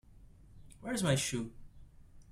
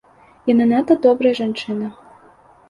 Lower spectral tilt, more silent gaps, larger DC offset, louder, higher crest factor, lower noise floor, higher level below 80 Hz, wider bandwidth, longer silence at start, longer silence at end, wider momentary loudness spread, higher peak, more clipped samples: second, -4.5 dB/octave vs -7 dB/octave; neither; neither; second, -35 LUFS vs -17 LUFS; about the same, 20 dB vs 16 dB; first, -57 dBFS vs -49 dBFS; about the same, -58 dBFS vs -60 dBFS; first, 15.5 kHz vs 7.2 kHz; second, 0.15 s vs 0.45 s; second, 0 s vs 0.75 s; first, 15 LU vs 11 LU; second, -18 dBFS vs -2 dBFS; neither